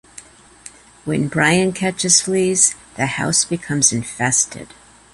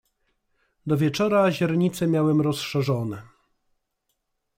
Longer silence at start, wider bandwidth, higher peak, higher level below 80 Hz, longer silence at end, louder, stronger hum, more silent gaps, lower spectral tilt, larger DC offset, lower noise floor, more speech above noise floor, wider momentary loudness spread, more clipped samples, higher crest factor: second, 0.15 s vs 0.85 s; second, 11.5 kHz vs 16 kHz; first, 0 dBFS vs -8 dBFS; first, -52 dBFS vs -60 dBFS; second, 0.5 s vs 1.3 s; first, -16 LUFS vs -23 LUFS; neither; neither; second, -3 dB/octave vs -6.5 dB/octave; neither; second, -43 dBFS vs -77 dBFS; second, 25 dB vs 54 dB; about the same, 9 LU vs 10 LU; neither; about the same, 20 dB vs 16 dB